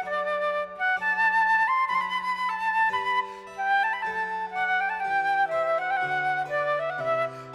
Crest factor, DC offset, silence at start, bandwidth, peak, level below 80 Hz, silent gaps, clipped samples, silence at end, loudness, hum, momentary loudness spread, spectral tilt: 12 dB; under 0.1%; 0 s; 12.5 kHz; -14 dBFS; -68 dBFS; none; under 0.1%; 0 s; -25 LUFS; none; 6 LU; -3.5 dB/octave